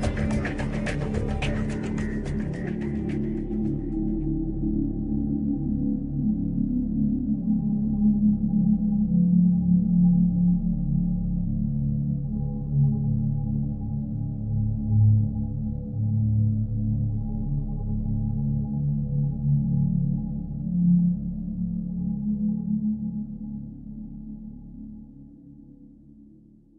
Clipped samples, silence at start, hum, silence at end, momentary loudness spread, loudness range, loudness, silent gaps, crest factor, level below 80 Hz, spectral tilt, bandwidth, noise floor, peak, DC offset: under 0.1%; 0 s; none; 0.55 s; 9 LU; 8 LU; -26 LUFS; none; 14 dB; -36 dBFS; -9.5 dB/octave; 9.2 kHz; -53 dBFS; -10 dBFS; under 0.1%